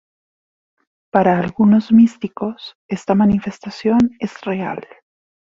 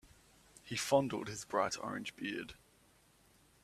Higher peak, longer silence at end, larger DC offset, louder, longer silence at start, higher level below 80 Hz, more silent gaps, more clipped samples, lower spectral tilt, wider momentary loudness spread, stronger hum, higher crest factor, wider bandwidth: first, -2 dBFS vs -16 dBFS; second, 0.8 s vs 1.05 s; neither; first, -17 LUFS vs -37 LUFS; first, 1.15 s vs 0.05 s; first, -50 dBFS vs -70 dBFS; first, 2.75-2.89 s vs none; neither; first, -8 dB/octave vs -4 dB/octave; about the same, 14 LU vs 12 LU; neither; second, 16 dB vs 24 dB; second, 7.6 kHz vs 15 kHz